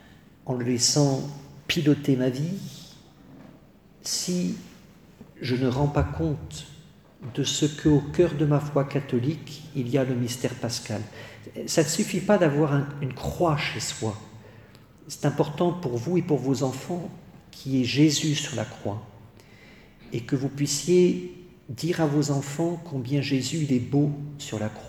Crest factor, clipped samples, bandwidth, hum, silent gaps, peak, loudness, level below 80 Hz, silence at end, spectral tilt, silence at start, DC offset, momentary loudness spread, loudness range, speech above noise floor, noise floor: 18 dB; under 0.1%; 16.5 kHz; none; none; -8 dBFS; -26 LUFS; -50 dBFS; 0 s; -5 dB/octave; 0.1 s; under 0.1%; 17 LU; 3 LU; 28 dB; -53 dBFS